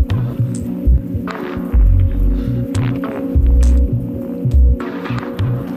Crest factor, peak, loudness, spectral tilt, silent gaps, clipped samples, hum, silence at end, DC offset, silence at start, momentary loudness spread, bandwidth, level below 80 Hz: 10 dB; -4 dBFS; -17 LUFS; -8.5 dB/octave; none; under 0.1%; none; 0 s; under 0.1%; 0 s; 9 LU; 9.4 kHz; -16 dBFS